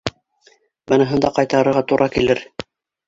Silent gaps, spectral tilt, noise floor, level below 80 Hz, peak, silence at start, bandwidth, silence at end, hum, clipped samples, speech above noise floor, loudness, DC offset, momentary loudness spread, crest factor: none; -6 dB/octave; -56 dBFS; -48 dBFS; 0 dBFS; 0.05 s; 7.8 kHz; 0.45 s; none; under 0.1%; 40 dB; -17 LUFS; under 0.1%; 17 LU; 18 dB